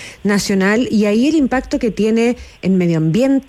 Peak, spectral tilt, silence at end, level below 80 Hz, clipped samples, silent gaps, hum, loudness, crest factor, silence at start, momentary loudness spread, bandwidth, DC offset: -4 dBFS; -6 dB/octave; 0.05 s; -42 dBFS; under 0.1%; none; none; -15 LUFS; 10 dB; 0 s; 4 LU; 14 kHz; under 0.1%